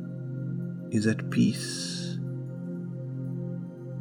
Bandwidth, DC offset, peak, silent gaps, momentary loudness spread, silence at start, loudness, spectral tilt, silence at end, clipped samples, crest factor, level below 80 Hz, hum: 16.5 kHz; under 0.1%; -12 dBFS; none; 11 LU; 0 s; -31 LUFS; -5.5 dB/octave; 0 s; under 0.1%; 18 dB; -74 dBFS; none